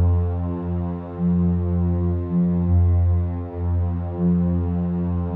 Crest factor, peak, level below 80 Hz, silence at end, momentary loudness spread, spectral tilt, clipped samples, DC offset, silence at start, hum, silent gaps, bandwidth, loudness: 10 dB; -10 dBFS; -32 dBFS; 0 s; 7 LU; -13.5 dB/octave; under 0.1%; under 0.1%; 0 s; none; none; 2.2 kHz; -22 LUFS